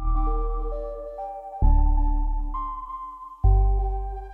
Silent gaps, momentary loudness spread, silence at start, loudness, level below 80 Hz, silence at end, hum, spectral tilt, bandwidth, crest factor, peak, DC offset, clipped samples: none; 13 LU; 0 s; -27 LUFS; -24 dBFS; 0 s; none; -11.5 dB/octave; 1.7 kHz; 14 dB; -8 dBFS; under 0.1%; under 0.1%